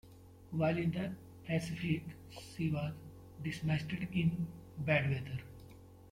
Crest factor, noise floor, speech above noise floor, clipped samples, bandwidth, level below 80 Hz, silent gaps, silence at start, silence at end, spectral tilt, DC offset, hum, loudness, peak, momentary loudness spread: 18 dB; -56 dBFS; 20 dB; under 0.1%; 15.5 kHz; -62 dBFS; none; 0.05 s; 0 s; -7 dB/octave; under 0.1%; none; -37 LUFS; -18 dBFS; 18 LU